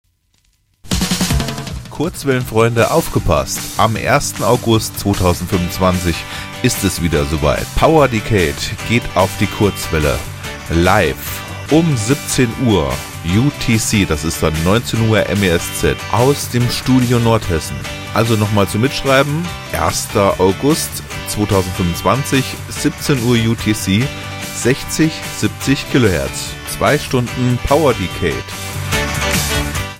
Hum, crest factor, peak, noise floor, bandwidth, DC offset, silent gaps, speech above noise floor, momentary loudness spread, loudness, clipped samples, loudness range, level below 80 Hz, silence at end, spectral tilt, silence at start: none; 16 dB; 0 dBFS; -59 dBFS; 17.5 kHz; 0.2%; none; 44 dB; 8 LU; -16 LUFS; under 0.1%; 2 LU; -30 dBFS; 0 s; -5 dB/octave; 0.85 s